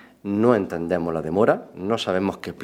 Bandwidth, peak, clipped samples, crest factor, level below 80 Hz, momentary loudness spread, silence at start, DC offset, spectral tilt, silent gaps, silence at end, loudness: 15.5 kHz; -4 dBFS; under 0.1%; 20 dB; -56 dBFS; 7 LU; 0.25 s; under 0.1%; -6.5 dB/octave; none; 0 s; -23 LUFS